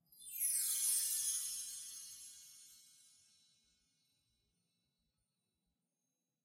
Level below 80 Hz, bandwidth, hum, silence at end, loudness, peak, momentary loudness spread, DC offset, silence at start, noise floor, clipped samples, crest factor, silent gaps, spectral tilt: under -90 dBFS; 16 kHz; none; 3.65 s; -37 LUFS; -24 dBFS; 21 LU; under 0.1%; 0.15 s; -90 dBFS; under 0.1%; 22 dB; none; 4.5 dB/octave